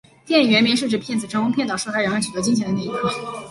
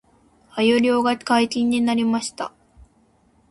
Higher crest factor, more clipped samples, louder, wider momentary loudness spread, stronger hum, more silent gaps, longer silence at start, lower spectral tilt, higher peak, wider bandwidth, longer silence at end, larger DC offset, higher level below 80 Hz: about the same, 16 dB vs 16 dB; neither; about the same, -20 LUFS vs -20 LUFS; second, 9 LU vs 14 LU; neither; neither; second, 0.25 s vs 0.55 s; about the same, -4 dB/octave vs -4 dB/octave; about the same, -4 dBFS vs -6 dBFS; about the same, 11.5 kHz vs 11.5 kHz; second, 0 s vs 1 s; neither; about the same, -56 dBFS vs -58 dBFS